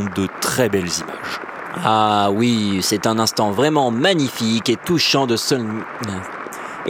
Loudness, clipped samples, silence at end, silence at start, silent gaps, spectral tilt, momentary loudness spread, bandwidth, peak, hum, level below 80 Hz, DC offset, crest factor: -18 LUFS; under 0.1%; 0 s; 0 s; none; -4 dB/octave; 11 LU; 19 kHz; 0 dBFS; none; -56 dBFS; under 0.1%; 18 dB